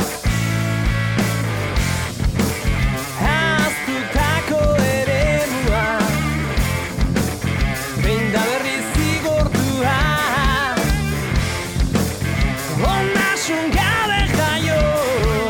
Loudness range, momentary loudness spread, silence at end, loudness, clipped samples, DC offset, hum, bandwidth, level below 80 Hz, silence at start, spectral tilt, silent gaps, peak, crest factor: 2 LU; 4 LU; 0 s; -19 LUFS; under 0.1%; under 0.1%; none; 18 kHz; -26 dBFS; 0 s; -5 dB/octave; none; -6 dBFS; 12 dB